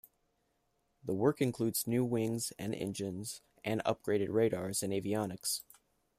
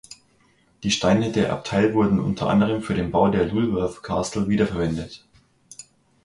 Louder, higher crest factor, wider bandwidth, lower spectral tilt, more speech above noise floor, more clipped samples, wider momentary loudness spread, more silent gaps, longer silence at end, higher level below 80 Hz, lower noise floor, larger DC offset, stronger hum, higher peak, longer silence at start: second, -35 LUFS vs -22 LUFS; about the same, 20 dB vs 18 dB; first, 15.5 kHz vs 11.5 kHz; about the same, -5 dB/octave vs -6 dB/octave; first, 44 dB vs 39 dB; neither; second, 8 LU vs 11 LU; neither; about the same, 0.55 s vs 0.45 s; second, -70 dBFS vs -46 dBFS; first, -78 dBFS vs -60 dBFS; neither; neither; second, -16 dBFS vs -4 dBFS; first, 1.05 s vs 0.1 s